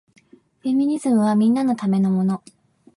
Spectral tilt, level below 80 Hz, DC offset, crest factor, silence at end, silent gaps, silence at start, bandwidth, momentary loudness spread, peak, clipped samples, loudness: -8 dB/octave; -66 dBFS; under 0.1%; 12 dB; 0.6 s; none; 0.65 s; 11.5 kHz; 7 LU; -8 dBFS; under 0.1%; -20 LUFS